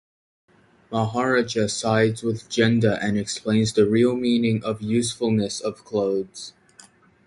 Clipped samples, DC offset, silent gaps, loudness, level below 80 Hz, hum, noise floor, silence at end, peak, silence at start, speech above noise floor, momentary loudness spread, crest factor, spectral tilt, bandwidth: under 0.1%; under 0.1%; none; -22 LUFS; -56 dBFS; none; -52 dBFS; 0.75 s; -4 dBFS; 0.9 s; 30 dB; 9 LU; 18 dB; -5.5 dB/octave; 11.5 kHz